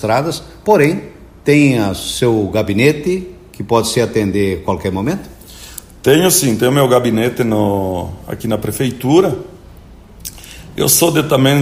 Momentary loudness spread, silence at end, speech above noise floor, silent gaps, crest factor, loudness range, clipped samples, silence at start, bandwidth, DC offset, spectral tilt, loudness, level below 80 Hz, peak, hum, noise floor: 19 LU; 0 s; 24 dB; none; 14 dB; 4 LU; under 0.1%; 0 s; 16 kHz; under 0.1%; -4.5 dB/octave; -14 LUFS; -40 dBFS; 0 dBFS; none; -38 dBFS